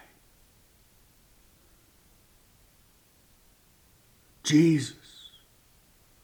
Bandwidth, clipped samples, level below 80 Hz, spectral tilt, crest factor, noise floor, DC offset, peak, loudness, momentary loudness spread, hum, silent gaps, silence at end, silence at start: 19.5 kHz; under 0.1%; -66 dBFS; -5.5 dB/octave; 22 dB; -62 dBFS; under 0.1%; -10 dBFS; -25 LUFS; 27 LU; none; none; 1.3 s; 4.45 s